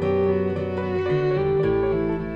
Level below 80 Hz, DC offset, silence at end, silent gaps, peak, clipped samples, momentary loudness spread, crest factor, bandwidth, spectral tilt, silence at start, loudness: -42 dBFS; under 0.1%; 0 s; none; -10 dBFS; under 0.1%; 4 LU; 12 dB; 5.4 kHz; -9.5 dB/octave; 0 s; -23 LUFS